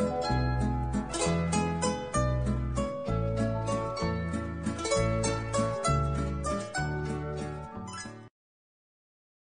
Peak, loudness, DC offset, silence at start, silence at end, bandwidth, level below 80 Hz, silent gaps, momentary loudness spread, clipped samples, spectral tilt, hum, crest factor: -14 dBFS; -31 LUFS; 0.2%; 0 s; 1.25 s; 10 kHz; -40 dBFS; none; 9 LU; under 0.1%; -5.5 dB/octave; none; 16 dB